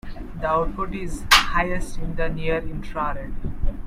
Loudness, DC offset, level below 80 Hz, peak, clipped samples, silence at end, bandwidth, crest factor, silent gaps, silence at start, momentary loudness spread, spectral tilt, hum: -23 LUFS; under 0.1%; -30 dBFS; 0 dBFS; under 0.1%; 0 s; 16 kHz; 22 dB; none; 0.05 s; 16 LU; -3.5 dB/octave; none